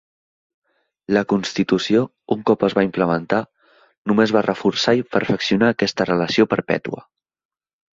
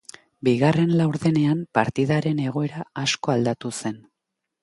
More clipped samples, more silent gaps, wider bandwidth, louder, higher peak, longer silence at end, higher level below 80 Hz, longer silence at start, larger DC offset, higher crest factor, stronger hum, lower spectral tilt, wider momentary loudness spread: neither; first, 3.97-4.05 s vs none; second, 7.6 kHz vs 11.5 kHz; first, -19 LUFS vs -23 LUFS; about the same, -2 dBFS vs -2 dBFS; first, 0.95 s vs 0.65 s; about the same, -56 dBFS vs -60 dBFS; first, 1.1 s vs 0.45 s; neither; about the same, 18 dB vs 20 dB; neither; about the same, -5.5 dB/octave vs -6 dB/octave; second, 7 LU vs 10 LU